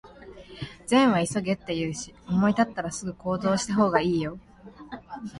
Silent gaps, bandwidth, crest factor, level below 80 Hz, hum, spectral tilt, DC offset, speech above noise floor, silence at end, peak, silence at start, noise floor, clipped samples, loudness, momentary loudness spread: none; 11.5 kHz; 20 dB; -54 dBFS; none; -5.5 dB/octave; under 0.1%; 21 dB; 0 s; -6 dBFS; 0.05 s; -46 dBFS; under 0.1%; -25 LUFS; 18 LU